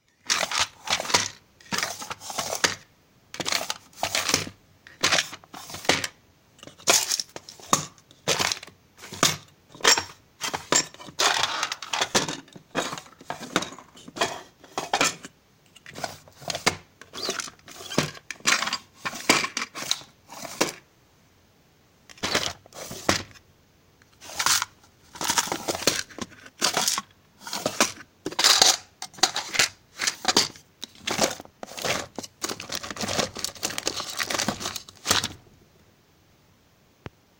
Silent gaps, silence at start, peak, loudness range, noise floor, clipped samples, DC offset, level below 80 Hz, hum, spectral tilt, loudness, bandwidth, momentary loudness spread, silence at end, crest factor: none; 0.25 s; 0 dBFS; 8 LU; -60 dBFS; under 0.1%; under 0.1%; -60 dBFS; none; -1 dB/octave; -25 LUFS; 17 kHz; 17 LU; 2 s; 28 dB